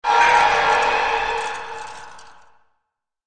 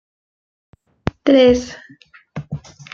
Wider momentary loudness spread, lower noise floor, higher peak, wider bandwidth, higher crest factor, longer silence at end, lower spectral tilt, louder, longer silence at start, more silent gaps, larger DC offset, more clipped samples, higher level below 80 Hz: about the same, 20 LU vs 22 LU; first, -76 dBFS vs -32 dBFS; about the same, -2 dBFS vs 0 dBFS; first, 10 kHz vs 7.4 kHz; about the same, 18 dB vs 18 dB; first, 1.05 s vs 0.35 s; second, -1 dB/octave vs -6 dB/octave; about the same, -17 LUFS vs -15 LUFS; second, 0.05 s vs 1.25 s; neither; first, 0.6% vs under 0.1%; neither; about the same, -48 dBFS vs -44 dBFS